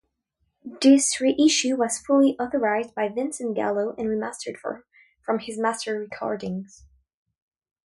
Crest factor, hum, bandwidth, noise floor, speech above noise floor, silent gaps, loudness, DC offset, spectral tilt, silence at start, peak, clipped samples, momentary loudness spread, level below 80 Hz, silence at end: 18 dB; none; 11.5 kHz; -75 dBFS; 52 dB; none; -23 LUFS; under 0.1%; -3.5 dB/octave; 0.65 s; -6 dBFS; under 0.1%; 16 LU; -64 dBFS; 1.2 s